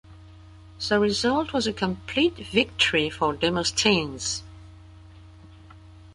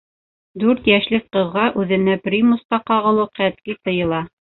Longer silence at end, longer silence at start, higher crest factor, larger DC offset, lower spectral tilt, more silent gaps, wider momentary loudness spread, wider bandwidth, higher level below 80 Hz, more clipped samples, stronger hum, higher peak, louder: second, 0.05 s vs 0.3 s; second, 0.1 s vs 0.55 s; about the same, 20 dB vs 18 dB; neither; second, -3.5 dB/octave vs -11 dB/octave; second, none vs 2.65-2.69 s; about the same, 8 LU vs 6 LU; first, 11.5 kHz vs 4.2 kHz; about the same, -48 dBFS vs -52 dBFS; neither; neither; second, -6 dBFS vs 0 dBFS; second, -24 LUFS vs -18 LUFS